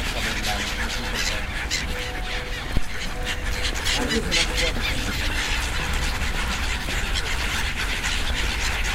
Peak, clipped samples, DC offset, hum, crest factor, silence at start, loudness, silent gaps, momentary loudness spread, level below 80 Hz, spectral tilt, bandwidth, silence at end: -6 dBFS; under 0.1%; under 0.1%; none; 18 dB; 0 s; -25 LUFS; none; 7 LU; -28 dBFS; -2.5 dB/octave; 16 kHz; 0 s